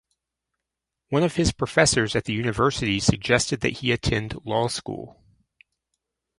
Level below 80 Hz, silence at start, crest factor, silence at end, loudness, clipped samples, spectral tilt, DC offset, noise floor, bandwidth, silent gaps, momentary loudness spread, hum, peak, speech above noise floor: -42 dBFS; 1.1 s; 24 dB; 1.3 s; -23 LUFS; under 0.1%; -4 dB/octave; under 0.1%; -85 dBFS; 11.5 kHz; none; 8 LU; none; -2 dBFS; 62 dB